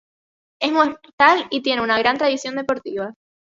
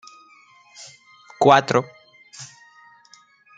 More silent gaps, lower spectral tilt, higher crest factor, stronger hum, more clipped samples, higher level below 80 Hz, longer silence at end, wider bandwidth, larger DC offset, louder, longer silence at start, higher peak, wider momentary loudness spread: first, 1.13-1.18 s vs none; second, -3.5 dB/octave vs -5 dB/octave; about the same, 20 dB vs 24 dB; neither; neither; about the same, -62 dBFS vs -66 dBFS; second, 0.3 s vs 1.1 s; second, 7.8 kHz vs 9.4 kHz; neither; about the same, -19 LUFS vs -17 LUFS; second, 0.6 s vs 1.4 s; about the same, 0 dBFS vs 0 dBFS; second, 11 LU vs 27 LU